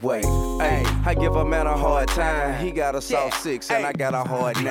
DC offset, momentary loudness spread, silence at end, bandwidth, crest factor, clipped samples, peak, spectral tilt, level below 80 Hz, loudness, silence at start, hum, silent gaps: under 0.1%; 3 LU; 0 s; 17 kHz; 12 dB; under 0.1%; -8 dBFS; -5 dB/octave; -28 dBFS; -23 LUFS; 0 s; none; none